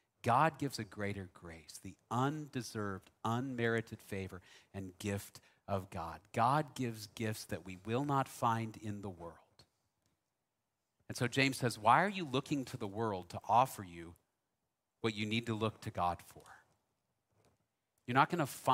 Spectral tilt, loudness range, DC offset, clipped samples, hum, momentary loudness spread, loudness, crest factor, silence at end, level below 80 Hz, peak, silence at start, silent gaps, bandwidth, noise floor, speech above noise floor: -5.5 dB/octave; 7 LU; under 0.1%; under 0.1%; none; 19 LU; -37 LUFS; 24 dB; 0 s; -70 dBFS; -14 dBFS; 0.25 s; none; 16 kHz; -88 dBFS; 51 dB